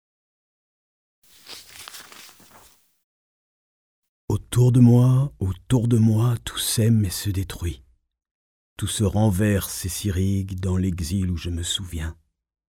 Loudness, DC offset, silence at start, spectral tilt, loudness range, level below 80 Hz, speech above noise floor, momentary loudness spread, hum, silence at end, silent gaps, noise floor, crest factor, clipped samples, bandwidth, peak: -22 LUFS; under 0.1%; 1.45 s; -6 dB/octave; 6 LU; -42 dBFS; 33 dB; 21 LU; none; 0.65 s; 3.04-4.03 s, 4.09-4.28 s, 8.31-8.76 s; -54 dBFS; 18 dB; under 0.1%; 17 kHz; -4 dBFS